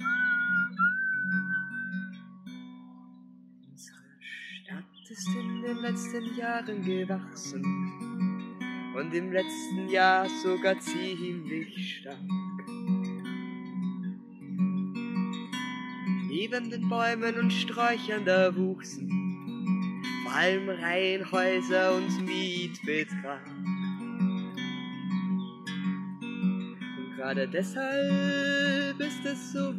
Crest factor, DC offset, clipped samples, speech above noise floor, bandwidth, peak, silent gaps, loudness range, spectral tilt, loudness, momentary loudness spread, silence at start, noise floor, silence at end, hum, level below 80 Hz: 20 dB; under 0.1%; under 0.1%; 24 dB; 12.5 kHz; -10 dBFS; none; 7 LU; -5.5 dB/octave; -30 LUFS; 13 LU; 0 s; -53 dBFS; 0 s; none; -88 dBFS